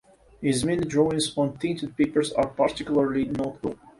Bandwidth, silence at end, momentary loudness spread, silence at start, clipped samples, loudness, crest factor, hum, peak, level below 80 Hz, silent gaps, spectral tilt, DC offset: 11.5 kHz; 0.25 s; 6 LU; 0.4 s; under 0.1%; -25 LUFS; 18 dB; none; -8 dBFS; -52 dBFS; none; -5.5 dB/octave; under 0.1%